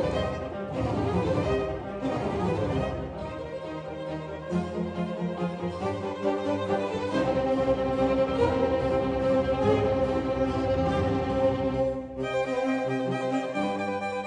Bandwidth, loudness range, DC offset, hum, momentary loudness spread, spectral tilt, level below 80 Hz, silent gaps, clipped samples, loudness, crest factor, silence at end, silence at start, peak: 9.8 kHz; 6 LU; under 0.1%; none; 8 LU; -7.5 dB/octave; -44 dBFS; none; under 0.1%; -28 LUFS; 16 dB; 0 s; 0 s; -12 dBFS